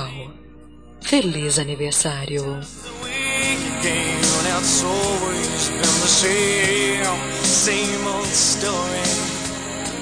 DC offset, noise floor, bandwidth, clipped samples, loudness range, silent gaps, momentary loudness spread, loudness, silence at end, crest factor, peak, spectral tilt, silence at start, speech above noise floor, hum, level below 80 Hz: 0.4%; -44 dBFS; 10.5 kHz; under 0.1%; 4 LU; none; 11 LU; -19 LUFS; 0 s; 16 dB; -4 dBFS; -2 dB/octave; 0 s; 24 dB; none; -46 dBFS